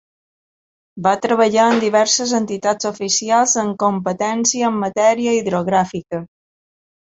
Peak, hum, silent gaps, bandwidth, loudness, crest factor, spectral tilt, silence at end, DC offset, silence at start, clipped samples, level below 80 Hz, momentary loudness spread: -2 dBFS; none; none; 8.2 kHz; -17 LUFS; 16 dB; -3 dB/octave; 0.8 s; under 0.1%; 0.95 s; under 0.1%; -60 dBFS; 6 LU